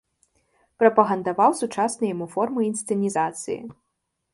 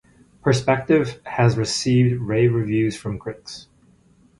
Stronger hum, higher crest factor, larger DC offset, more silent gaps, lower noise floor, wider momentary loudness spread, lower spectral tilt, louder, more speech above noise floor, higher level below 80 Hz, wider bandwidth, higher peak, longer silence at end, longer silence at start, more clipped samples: neither; about the same, 22 dB vs 18 dB; neither; neither; first, -67 dBFS vs -55 dBFS; about the same, 12 LU vs 14 LU; about the same, -5.5 dB/octave vs -6 dB/octave; second, -23 LUFS vs -20 LUFS; first, 45 dB vs 36 dB; second, -70 dBFS vs -50 dBFS; about the same, 11.5 kHz vs 11.5 kHz; about the same, -2 dBFS vs -2 dBFS; second, 0.6 s vs 0.75 s; first, 0.8 s vs 0.45 s; neither